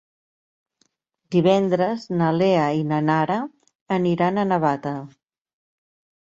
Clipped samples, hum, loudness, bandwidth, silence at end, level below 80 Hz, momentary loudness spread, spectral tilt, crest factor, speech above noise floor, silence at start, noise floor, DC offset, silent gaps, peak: under 0.1%; none; -21 LUFS; 7.6 kHz; 1.2 s; -64 dBFS; 9 LU; -7.5 dB/octave; 16 dB; 48 dB; 1.3 s; -69 dBFS; under 0.1%; 3.75-3.86 s; -6 dBFS